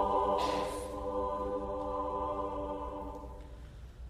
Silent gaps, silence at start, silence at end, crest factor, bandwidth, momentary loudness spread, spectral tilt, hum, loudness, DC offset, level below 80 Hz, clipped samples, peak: none; 0 s; 0 s; 16 dB; 15 kHz; 18 LU; -5.5 dB/octave; none; -36 LUFS; under 0.1%; -48 dBFS; under 0.1%; -20 dBFS